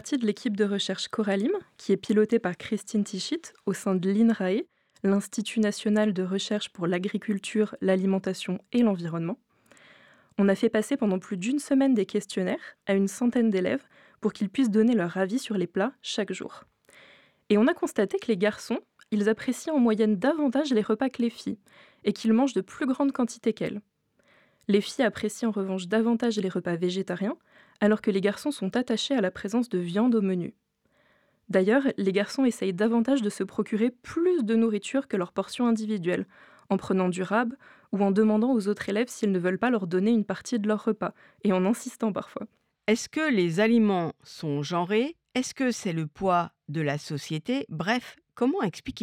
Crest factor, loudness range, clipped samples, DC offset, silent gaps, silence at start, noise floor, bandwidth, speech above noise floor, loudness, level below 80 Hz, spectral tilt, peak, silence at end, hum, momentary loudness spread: 16 dB; 3 LU; under 0.1%; under 0.1%; none; 0.05 s; -68 dBFS; 13.5 kHz; 42 dB; -27 LUFS; -70 dBFS; -6 dB/octave; -10 dBFS; 0 s; none; 9 LU